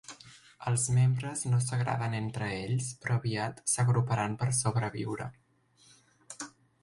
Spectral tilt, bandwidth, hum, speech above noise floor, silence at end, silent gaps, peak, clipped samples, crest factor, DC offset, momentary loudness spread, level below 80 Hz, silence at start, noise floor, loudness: -5 dB/octave; 11.5 kHz; none; 34 dB; 0.35 s; none; -14 dBFS; under 0.1%; 16 dB; under 0.1%; 16 LU; -62 dBFS; 0.1 s; -64 dBFS; -31 LUFS